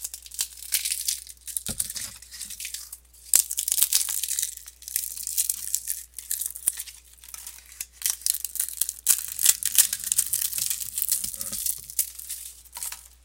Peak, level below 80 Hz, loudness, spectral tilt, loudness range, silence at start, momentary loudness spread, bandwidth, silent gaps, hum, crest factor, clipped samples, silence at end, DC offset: 0 dBFS; -56 dBFS; -25 LUFS; 2 dB/octave; 6 LU; 0 s; 17 LU; 17.5 kHz; none; none; 28 dB; under 0.1%; 0.15 s; under 0.1%